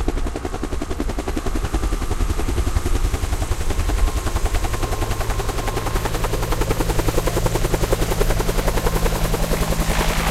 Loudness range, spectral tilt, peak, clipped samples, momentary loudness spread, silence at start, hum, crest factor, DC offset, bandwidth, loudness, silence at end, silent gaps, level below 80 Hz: 3 LU; -5 dB/octave; -4 dBFS; under 0.1%; 4 LU; 0 s; none; 16 dB; under 0.1%; 16 kHz; -23 LUFS; 0 s; none; -22 dBFS